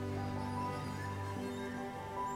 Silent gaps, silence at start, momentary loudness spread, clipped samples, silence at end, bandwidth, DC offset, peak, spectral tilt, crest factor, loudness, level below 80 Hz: none; 0 s; 3 LU; under 0.1%; 0 s; 16 kHz; under 0.1%; -28 dBFS; -6.5 dB/octave; 12 dB; -41 LUFS; -62 dBFS